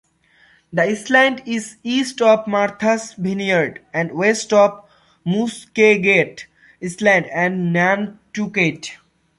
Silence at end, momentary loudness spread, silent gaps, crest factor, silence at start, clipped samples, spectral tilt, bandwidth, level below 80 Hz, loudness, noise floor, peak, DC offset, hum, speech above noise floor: 0.45 s; 12 LU; none; 18 dB; 0.7 s; under 0.1%; -5 dB/octave; 11.5 kHz; -62 dBFS; -18 LUFS; -55 dBFS; -2 dBFS; under 0.1%; none; 37 dB